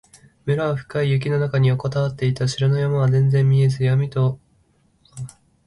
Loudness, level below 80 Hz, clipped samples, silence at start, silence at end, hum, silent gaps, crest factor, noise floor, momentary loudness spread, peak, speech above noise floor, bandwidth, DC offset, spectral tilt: -20 LUFS; -52 dBFS; under 0.1%; 0.45 s; 0.4 s; none; none; 12 dB; -60 dBFS; 17 LU; -8 dBFS; 42 dB; 11 kHz; under 0.1%; -7.5 dB/octave